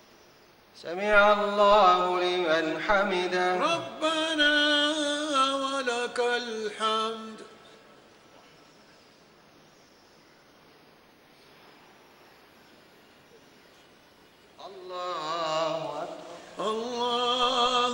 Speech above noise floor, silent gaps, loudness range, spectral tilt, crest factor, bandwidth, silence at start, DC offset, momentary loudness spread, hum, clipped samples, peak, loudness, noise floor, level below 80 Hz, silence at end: 33 dB; none; 12 LU; -3 dB/octave; 20 dB; 16 kHz; 0.75 s; under 0.1%; 18 LU; none; under 0.1%; -8 dBFS; -25 LUFS; -57 dBFS; -60 dBFS; 0 s